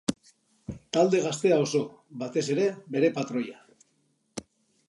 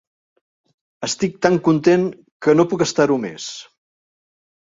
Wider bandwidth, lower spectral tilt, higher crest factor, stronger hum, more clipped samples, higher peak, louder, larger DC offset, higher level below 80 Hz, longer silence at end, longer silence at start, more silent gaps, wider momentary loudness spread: first, 11.5 kHz vs 7.8 kHz; about the same, -5 dB/octave vs -5 dB/octave; about the same, 20 dB vs 20 dB; neither; neither; second, -8 dBFS vs 0 dBFS; second, -27 LUFS vs -18 LUFS; neither; about the same, -62 dBFS vs -60 dBFS; second, 0.45 s vs 1.1 s; second, 0.1 s vs 1 s; second, none vs 2.32-2.40 s; first, 19 LU vs 13 LU